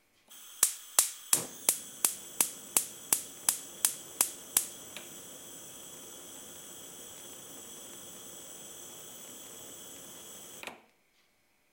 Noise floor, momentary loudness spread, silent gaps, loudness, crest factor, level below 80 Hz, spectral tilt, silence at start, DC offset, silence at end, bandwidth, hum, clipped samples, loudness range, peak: -72 dBFS; 17 LU; none; -30 LUFS; 32 dB; -80 dBFS; 0.5 dB/octave; 0.3 s; under 0.1%; 0.9 s; 16.5 kHz; none; under 0.1%; 16 LU; -4 dBFS